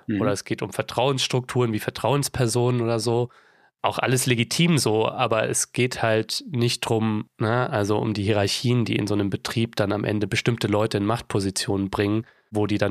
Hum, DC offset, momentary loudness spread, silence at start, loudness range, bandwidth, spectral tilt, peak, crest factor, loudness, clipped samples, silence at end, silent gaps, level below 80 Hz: none; under 0.1%; 5 LU; 0.1 s; 2 LU; 15 kHz; -5 dB/octave; -4 dBFS; 18 dB; -23 LUFS; under 0.1%; 0 s; none; -56 dBFS